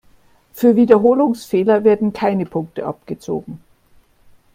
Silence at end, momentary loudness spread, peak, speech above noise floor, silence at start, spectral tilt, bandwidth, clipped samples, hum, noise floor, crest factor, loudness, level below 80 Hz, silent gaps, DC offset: 0.95 s; 15 LU; 0 dBFS; 37 dB; 0.55 s; -7.5 dB/octave; 16.5 kHz; under 0.1%; none; -52 dBFS; 18 dB; -16 LUFS; -56 dBFS; none; under 0.1%